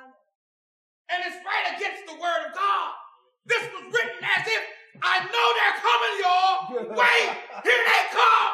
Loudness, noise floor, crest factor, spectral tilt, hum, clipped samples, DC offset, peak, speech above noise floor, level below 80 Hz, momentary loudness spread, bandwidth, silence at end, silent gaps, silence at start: -23 LUFS; under -90 dBFS; 18 dB; -1 dB/octave; none; under 0.1%; under 0.1%; -6 dBFS; over 67 dB; under -90 dBFS; 11 LU; 15 kHz; 0 s; none; 1.1 s